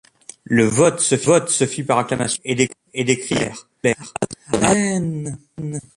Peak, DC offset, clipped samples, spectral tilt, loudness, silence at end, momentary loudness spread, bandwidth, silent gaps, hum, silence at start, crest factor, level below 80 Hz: -2 dBFS; under 0.1%; under 0.1%; -4 dB/octave; -19 LUFS; 0.15 s; 11 LU; 11.5 kHz; none; none; 0.5 s; 18 dB; -50 dBFS